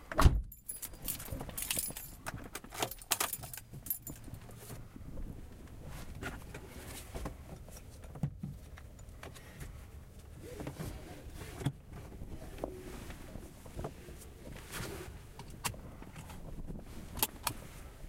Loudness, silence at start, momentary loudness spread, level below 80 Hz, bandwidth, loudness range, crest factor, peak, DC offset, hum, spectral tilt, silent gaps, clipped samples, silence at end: -41 LUFS; 0 s; 16 LU; -46 dBFS; 17 kHz; 10 LU; 30 dB; -10 dBFS; under 0.1%; none; -4 dB/octave; none; under 0.1%; 0 s